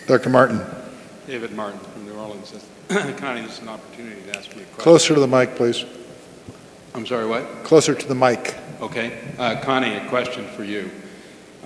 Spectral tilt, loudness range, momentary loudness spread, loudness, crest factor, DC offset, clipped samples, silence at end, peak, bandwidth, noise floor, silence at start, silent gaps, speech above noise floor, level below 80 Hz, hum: -4.5 dB/octave; 10 LU; 23 LU; -20 LUFS; 22 dB; under 0.1%; under 0.1%; 0.2 s; 0 dBFS; 11 kHz; -43 dBFS; 0 s; none; 22 dB; -62 dBFS; none